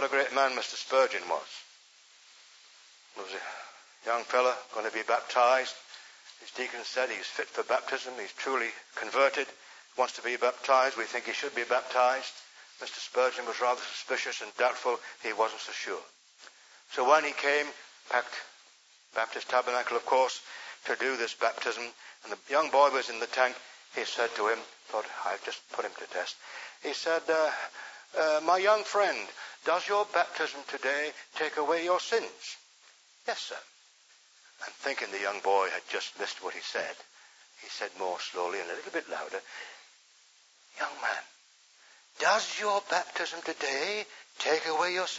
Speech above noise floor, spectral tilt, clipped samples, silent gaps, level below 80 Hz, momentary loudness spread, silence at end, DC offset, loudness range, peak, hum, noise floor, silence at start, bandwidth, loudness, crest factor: 31 dB; -0.5 dB/octave; under 0.1%; none; under -90 dBFS; 16 LU; 0 s; under 0.1%; 7 LU; -8 dBFS; none; -62 dBFS; 0 s; 8 kHz; -30 LUFS; 24 dB